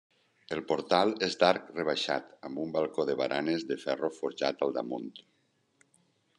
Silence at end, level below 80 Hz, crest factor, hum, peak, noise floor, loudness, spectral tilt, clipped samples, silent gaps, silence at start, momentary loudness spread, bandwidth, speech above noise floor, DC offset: 1.2 s; -74 dBFS; 24 dB; none; -8 dBFS; -70 dBFS; -31 LUFS; -4.5 dB/octave; under 0.1%; none; 0.5 s; 12 LU; 10.5 kHz; 40 dB; under 0.1%